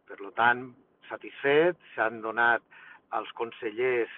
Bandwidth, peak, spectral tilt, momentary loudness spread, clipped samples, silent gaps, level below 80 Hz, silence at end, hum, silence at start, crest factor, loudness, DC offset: 4.1 kHz; -10 dBFS; -8 dB/octave; 16 LU; under 0.1%; none; -74 dBFS; 0 s; none; 0.1 s; 20 dB; -28 LUFS; under 0.1%